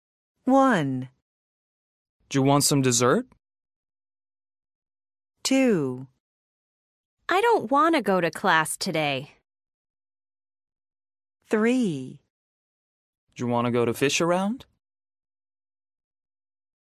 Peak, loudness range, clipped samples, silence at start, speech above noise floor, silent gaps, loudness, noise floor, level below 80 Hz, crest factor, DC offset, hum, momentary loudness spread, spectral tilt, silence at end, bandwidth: -6 dBFS; 6 LU; under 0.1%; 0.45 s; over 67 dB; 1.22-2.20 s, 3.76-3.83 s, 4.75-4.82 s, 6.20-7.17 s, 9.74-9.94 s, 12.30-13.27 s; -23 LUFS; under -90 dBFS; -70 dBFS; 20 dB; under 0.1%; none; 13 LU; -4.5 dB/octave; 2.25 s; 15.5 kHz